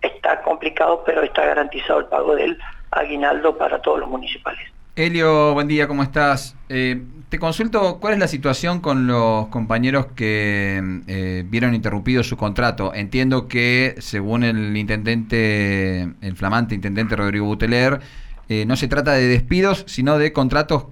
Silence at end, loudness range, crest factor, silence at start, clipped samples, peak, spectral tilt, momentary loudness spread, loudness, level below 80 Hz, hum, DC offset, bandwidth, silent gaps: 0 s; 2 LU; 14 dB; 0 s; under 0.1%; -4 dBFS; -6.5 dB/octave; 8 LU; -19 LUFS; -36 dBFS; none; under 0.1%; 16 kHz; none